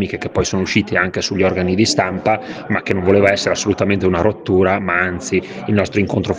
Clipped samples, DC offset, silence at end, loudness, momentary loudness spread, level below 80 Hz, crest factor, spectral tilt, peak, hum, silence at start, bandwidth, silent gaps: under 0.1%; under 0.1%; 0 s; -17 LUFS; 6 LU; -44 dBFS; 16 dB; -5 dB/octave; 0 dBFS; none; 0 s; 10 kHz; none